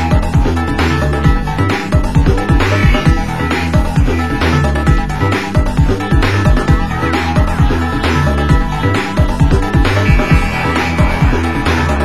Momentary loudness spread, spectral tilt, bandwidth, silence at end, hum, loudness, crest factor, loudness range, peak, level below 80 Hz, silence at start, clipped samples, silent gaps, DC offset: 3 LU; -6.5 dB/octave; 12.5 kHz; 0 s; none; -13 LUFS; 12 dB; 1 LU; 0 dBFS; -16 dBFS; 0 s; under 0.1%; none; 3%